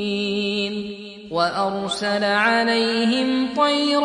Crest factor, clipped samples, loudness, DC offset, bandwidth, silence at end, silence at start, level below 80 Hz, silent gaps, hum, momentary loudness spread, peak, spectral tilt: 16 dB; under 0.1%; -20 LUFS; under 0.1%; 11 kHz; 0 s; 0 s; -60 dBFS; none; none; 10 LU; -4 dBFS; -4 dB/octave